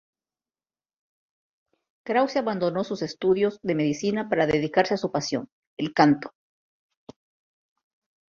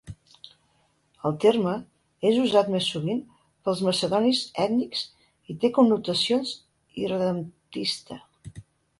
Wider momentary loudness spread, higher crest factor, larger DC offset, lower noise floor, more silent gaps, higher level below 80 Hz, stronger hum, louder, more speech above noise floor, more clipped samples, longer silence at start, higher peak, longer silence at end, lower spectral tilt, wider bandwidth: second, 10 LU vs 20 LU; about the same, 24 dB vs 20 dB; neither; first, under -90 dBFS vs -67 dBFS; first, 5.52-5.77 s vs none; about the same, -62 dBFS vs -62 dBFS; neither; about the same, -25 LUFS vs -25 LUFS; first, over 66 dB vs 43 dB; neither; first, 2.05 s vs 0.05 s; first, -2 dBFS vs -6 dBFS; first, 2 s vs 0.4 s; about the same, -5.5 dB/octave vs -5.5 dB/octave; second, 7.4 kHz vs 11.5 kHz